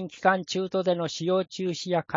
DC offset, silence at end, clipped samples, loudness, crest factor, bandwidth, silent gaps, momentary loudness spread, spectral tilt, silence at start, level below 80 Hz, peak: under 0.1%; 0 s; under 0.1%; -27 LUFS; 22 dB; 7.6 kHz; none; 5 LU; -5 dB/octave; 0 s; -72 dBFS; -6 dBFS